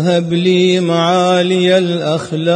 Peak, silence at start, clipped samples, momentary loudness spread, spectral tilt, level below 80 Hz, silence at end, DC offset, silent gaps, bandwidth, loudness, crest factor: -2 dBFS; 0 s; under 0.1%; 5 LU; -6 dB/octave; -62 dBFS; 0 s; under 0.1%; none; 10 kHz; -13 LUFS; 12 dB